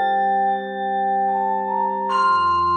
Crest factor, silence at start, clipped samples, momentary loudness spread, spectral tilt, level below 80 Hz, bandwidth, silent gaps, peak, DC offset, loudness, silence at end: 10 dB; 0 s; under 0.1%; 5 LU; -5.5 dB/octave; -58 dBFS; 8.8 kHz; none; -10 dBFS; under 0.1%; -20 LUFS; 0 s